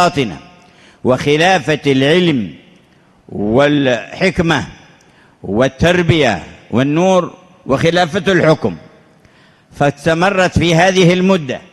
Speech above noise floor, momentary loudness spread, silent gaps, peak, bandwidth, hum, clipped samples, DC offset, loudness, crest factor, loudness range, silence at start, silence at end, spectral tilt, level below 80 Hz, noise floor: 37 dB; 11 LU; none; 0 dBFS; 12.5 kHz; none; under 0.1%; under 0.1%; -13 LUFS; 14 dB; 2 LU; 0 s; 0.15 s; -5.5 dB/octave; -40 dBFS; -49 dBFS